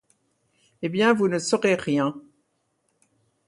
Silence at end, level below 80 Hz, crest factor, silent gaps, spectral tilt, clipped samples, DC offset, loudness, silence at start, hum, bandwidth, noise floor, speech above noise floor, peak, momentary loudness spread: 1.3 s; -68 dBFS; 20 dB; none; -5 dB/octave; under 0.1%; under 0.1%; -23 LUFS; 0.8 s; none; 11.5 kHz; -72 dBFS; 50 dB; -6 dBFS; 11 LU